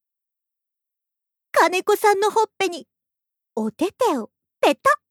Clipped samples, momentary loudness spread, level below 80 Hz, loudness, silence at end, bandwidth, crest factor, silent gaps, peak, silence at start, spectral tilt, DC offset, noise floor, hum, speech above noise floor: under 0.1%; 11 LU; -72 dBFS; -21 LUFS; 0.15 s; 19 kHz; 18 dB; none; -4 dBFS; 1.55 s; -3 dB/octave; under 0.1%; -85 dBFS; none; 65 dB